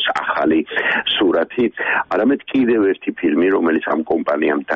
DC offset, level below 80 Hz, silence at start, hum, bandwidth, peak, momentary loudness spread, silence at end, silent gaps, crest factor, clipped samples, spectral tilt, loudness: under 0.1%; -56 dBFS; 0 s; none; 7.6 kHz; -6 dBFS; 4 LU; 0 s; none; 10 dB; under 0.1%; -6 dB/octave; -17 LUFS